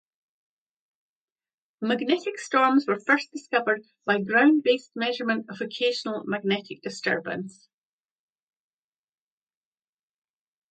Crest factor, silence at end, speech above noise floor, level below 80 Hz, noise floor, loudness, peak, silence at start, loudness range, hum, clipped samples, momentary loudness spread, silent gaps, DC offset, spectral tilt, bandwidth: 22 dB; 3.2 s; over 65 dB; -78 dBFS; under -90 dBFS; -25 LUFS; -6 dBFS; 1.8 s; 11 LU; none; under 0.1%; 11 LU; none; under 0.1%; -4.5 dB/octave; 9.2 kHz